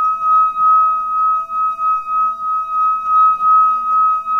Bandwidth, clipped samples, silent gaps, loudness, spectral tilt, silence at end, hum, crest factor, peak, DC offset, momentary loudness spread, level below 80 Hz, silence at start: 6 kHz; under 0.1%; none; -14 LUFS; -3.5 dB/octave; 0 s; none; 8 dB; -6 dBFS; 0.2%; 6 LU; -58 dBFS; 0 s